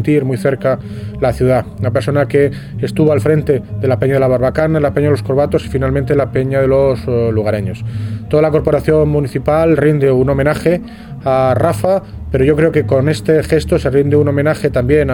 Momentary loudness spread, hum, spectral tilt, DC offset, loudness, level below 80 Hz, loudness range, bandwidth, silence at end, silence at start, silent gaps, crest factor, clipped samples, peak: 6 LU; none; -8 dB/octave; under 0.1%; -14 LUFS; -32 dBFS; 2 LU; 17 kHz; 0 s; 0 s; none; 12 dB; under 0.1%; 0 dBFS